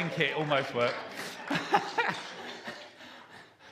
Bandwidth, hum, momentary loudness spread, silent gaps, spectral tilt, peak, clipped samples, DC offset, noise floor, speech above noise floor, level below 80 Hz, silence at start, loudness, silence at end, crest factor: 15.5 kHz; none; 21 LU; none; -4.5 dB/octave; -8 dBFS; under 0.1%; under 0.1%; -53 dBFS; 22 dB; -78 dBFS; 0 s; -31 LUFS; 0 s; 26 dB